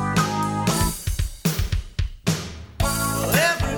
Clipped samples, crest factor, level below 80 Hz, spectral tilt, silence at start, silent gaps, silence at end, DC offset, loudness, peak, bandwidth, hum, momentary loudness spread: under 0.1%; 16 dB; -30 dBFS; -4 dB/octave; 0 s; none; 0 s; under 0.1%; -23 LUFS; -6 dBFS; over 20 kHz; none; 9 LU